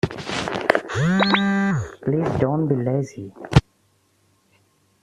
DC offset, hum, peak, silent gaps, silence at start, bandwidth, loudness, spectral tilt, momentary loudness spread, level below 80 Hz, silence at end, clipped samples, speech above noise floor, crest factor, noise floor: under 0.1%; none; 0 dBFS; none; 0.05 s; 12 kHz; -21 LUFS; -6.5 dB/octave; 8 LU; -40 dBFS; 1.45 s; under 0.1%; 41 dB; 22 dB; -63 dBFS